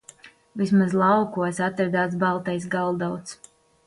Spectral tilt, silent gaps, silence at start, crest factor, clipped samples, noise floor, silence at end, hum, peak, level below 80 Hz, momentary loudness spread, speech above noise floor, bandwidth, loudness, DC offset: -6.5 dB/octave; none; 0.25 s; 16 dB; under 0.1%; -50 dBFS; 0.5 s; none; -8 dBFS; -64 dBFS; 11 LU; 27 dB; 11.5 kHz; -23 LUFS; under 0.1%